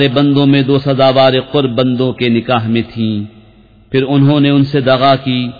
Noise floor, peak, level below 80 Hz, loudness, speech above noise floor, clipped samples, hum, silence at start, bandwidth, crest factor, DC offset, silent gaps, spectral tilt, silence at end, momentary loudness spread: -43 dBFS; 0 dBFS; -46 dBFS; -12 LUFS; 32 dB; under 0.1%; none; 0 s; 5 kHz; 12 dB; under 0.1%; none; -9 dB/octave; 0.05 s; 8 LU